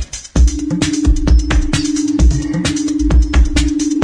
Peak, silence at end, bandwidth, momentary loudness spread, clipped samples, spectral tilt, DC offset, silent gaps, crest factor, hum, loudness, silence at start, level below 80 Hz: -2 dBFS; 0 s; 10.5 kHz; 3 LU; under 0.1%; -5.5 dB/octave; under 0.1%; none; 12 dB; none; -15 LUFS; 0 s; -14 dBFS